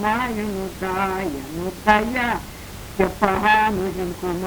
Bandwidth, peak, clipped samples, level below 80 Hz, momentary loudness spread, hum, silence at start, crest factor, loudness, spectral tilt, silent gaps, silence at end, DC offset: over 20 kHz; 0 dBFS; under 0.1%; -40 dBFS; 12 LU; none; 0 s; 22 dB; -21 LUFS; -5 dB/octave; none; 0 s; under 0.1%